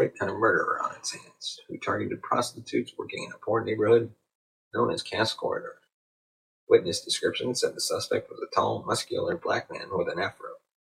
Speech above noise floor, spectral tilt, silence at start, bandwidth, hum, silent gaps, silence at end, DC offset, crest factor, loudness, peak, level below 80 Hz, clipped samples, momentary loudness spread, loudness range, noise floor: over 62 dB; -3.5 dB/octave; 0 s; 16 kHz; none; 4.35-4.71 s, 5.92-6.67 s; 0.4 s; under 0.1%; 22 dB; -28 LUFS; -6 dBFS; -68 dBFS; under 0.1%; 12 LU; 2 LU; under -90 dBFS